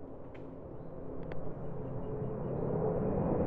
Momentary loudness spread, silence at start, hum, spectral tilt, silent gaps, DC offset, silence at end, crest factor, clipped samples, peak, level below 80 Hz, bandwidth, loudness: 14 LU; 0 s; none; -10.5 dB/octave; none; under 0.1%; 0 s; 16 dB; under 0.1%; -20 dBFS; -50 dBFS; 3.7 kHz; -38 LUFS